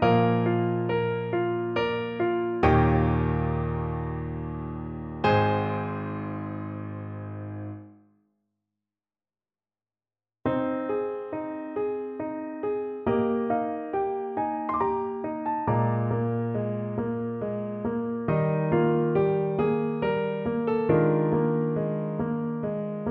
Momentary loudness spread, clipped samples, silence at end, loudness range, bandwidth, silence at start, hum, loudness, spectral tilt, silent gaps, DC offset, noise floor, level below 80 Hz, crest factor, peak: 11 LU; under 0.1%; 0 s; 11 LU; 5.8 kHz; 0 s; none; -27 LUFS; -10 dB/octave; none; under 0.1%; under -90 dBFS; -44 dBFS; 18 dB; -8 dBFS